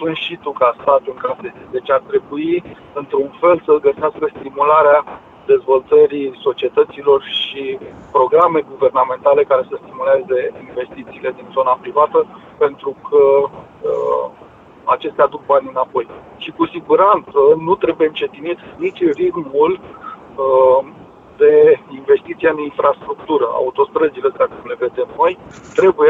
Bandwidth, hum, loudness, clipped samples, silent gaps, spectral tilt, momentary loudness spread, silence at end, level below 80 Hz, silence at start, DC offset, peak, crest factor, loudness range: 7.2 kHz; none; -16 LUFS; under 0.1%; none; -6.5 dB/octave; 14 LU; 0 s; -56 dBFS; 0 s; under 0.1%; 0 dBFS; 14 dB; 3 LU